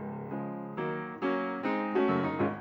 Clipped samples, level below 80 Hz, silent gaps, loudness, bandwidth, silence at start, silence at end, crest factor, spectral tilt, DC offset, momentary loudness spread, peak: under 0.1%; -72 dBFS; none; -32 LUFS; 6.6 kHz; 0 s; 0 s; 16 dB; -8.5 dB/octave; under 0.1%; 9 LU; -16 dBFS